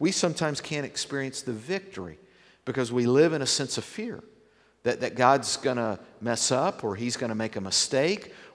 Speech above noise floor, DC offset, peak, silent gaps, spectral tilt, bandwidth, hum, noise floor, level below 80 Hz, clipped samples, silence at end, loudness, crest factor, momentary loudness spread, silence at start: 34 dB; under 0.1%; -6 dBFS; none; -3.5 dB/octave; 11 kHz; none; -61 dBFS; -68 dBFS; under 0.1%; 0.05 s; -27 LUFS; 22 dB; 13 LU; 0 s